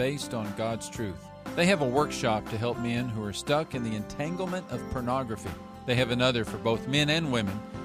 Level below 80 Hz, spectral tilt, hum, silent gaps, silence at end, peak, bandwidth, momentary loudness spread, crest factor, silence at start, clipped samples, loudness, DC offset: -52 dBFS; -5 dB/octave; none; none; 0 s; -10 dBFS; 15.5 kHz; 11 LU; 18 dB; 0 s; under 0.1%; -29 LUFS; under 0.1%